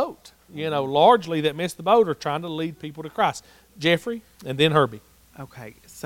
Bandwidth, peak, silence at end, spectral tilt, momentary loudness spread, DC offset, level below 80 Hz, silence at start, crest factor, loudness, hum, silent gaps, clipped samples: 17 kHz; -2 dBFS; 0.05 s; -5.5 dB/octave; 22 LU; under 0.1%; -60 dBFS; 0 s; 20 dB; -22 LUFS; none; none; under 0.1%